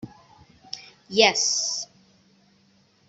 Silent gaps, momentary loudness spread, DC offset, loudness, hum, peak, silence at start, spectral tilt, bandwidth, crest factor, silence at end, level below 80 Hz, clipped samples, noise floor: none; 21 LU; under 0.1%; -21 LUFS; none; -2 dBFS; 0.05 s; -0.5 dB/octave; 8.2 kHz; 26 dB; 1.25 s; -68 dBFS; under 0.1%; -61 dBFS